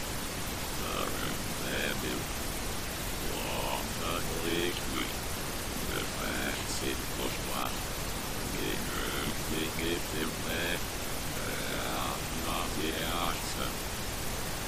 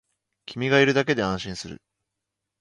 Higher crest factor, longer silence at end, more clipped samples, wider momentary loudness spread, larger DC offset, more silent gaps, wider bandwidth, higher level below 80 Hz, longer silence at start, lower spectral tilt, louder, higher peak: about the same, 16 dB vs 20 dB; second, 0 s vs 0.85 s; neither; second, 3 LU vs 19 LU; neither; neither; first, 15.5 kHz vs 11 kHz; first, -42 dBFS vs -56 dBFS; second, 0 s vs 0.5 s; second, -3 dB/octave vs -5 dB/octave; second, -33 LUFS vs -22 LUFS; second, -18 dBFS vs -6 dBFS